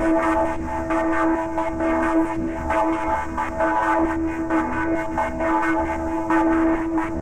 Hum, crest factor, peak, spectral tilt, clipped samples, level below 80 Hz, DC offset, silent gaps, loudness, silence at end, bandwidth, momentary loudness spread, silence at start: none; 12 dB; -8 dBFS; -7 dB/octave; under 0.1%; -36 dBFS; under 0.1%; none; -22 LUFS; 0 s; 9.8 kHz; 5 LU; 0 s